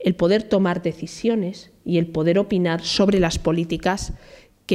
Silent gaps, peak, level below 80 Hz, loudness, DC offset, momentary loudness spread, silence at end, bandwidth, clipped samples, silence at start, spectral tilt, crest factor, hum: none; -6 dBFS; -40 dBFS; -21 LUFS; under 0.1%; 11 LU; 0 s; 13 kHz; under 0.1%; 0 s; -6 dB/octave; 14 dB; none